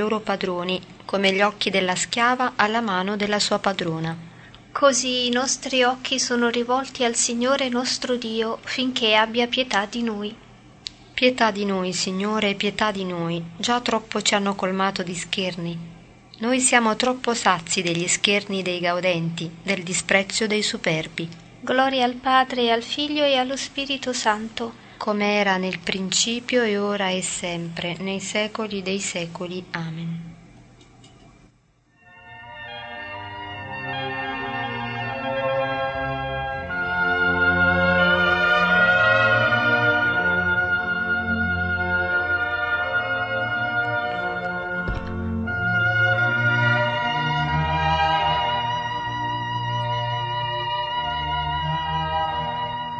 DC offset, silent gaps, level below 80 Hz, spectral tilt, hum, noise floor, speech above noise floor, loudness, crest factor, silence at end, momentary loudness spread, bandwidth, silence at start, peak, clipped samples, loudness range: under 0.1%; none; -48 dBFS; -3.5 dB/octave; none; -60 dBFS; 37 dB; -22 LUFS; 22 dB; 0 s; 11 LU; 9.2 kHz; 0 s; -2 dBFS; under 0.1%; 9 LU